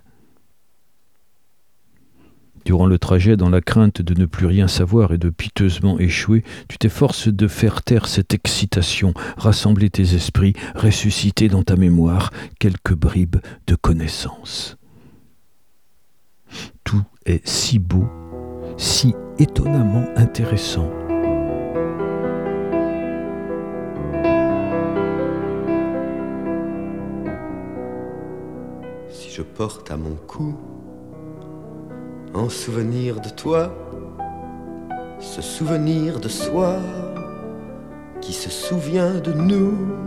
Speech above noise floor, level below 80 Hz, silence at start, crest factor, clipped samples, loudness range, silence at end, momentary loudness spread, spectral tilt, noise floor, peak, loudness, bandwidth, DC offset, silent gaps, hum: 49 dB; -34 dBFS; 2.65 s; 18 dB; under 0.1%; 12 LU; 0 s; 18 LU; -6 dB/octave; -66 dBFS; -2 dBFS; -19 LUFS; 15 kHz; 0.4%; none; none